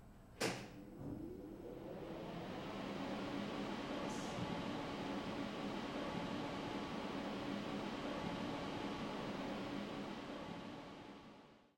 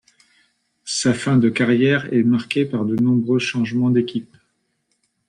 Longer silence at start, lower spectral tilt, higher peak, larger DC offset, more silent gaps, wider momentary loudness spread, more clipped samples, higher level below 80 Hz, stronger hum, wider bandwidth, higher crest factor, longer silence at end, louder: second, 0 s vs 0.85 s; about the same, -5 dB/octave vs -5.5 dB/octave; second, -24 dBFS vs -6 dBFS; neither; neither; about the same, 8 LU vs 6 LU; neither; second, -66 dBFS vs -60 dBFS; neither; first, 16 kHz vs 10.5 kHz; first, 20 dB vs 14 dB; second, 0.1 s vs 1.05 s; second, -45 LUFS vs -19 LUFS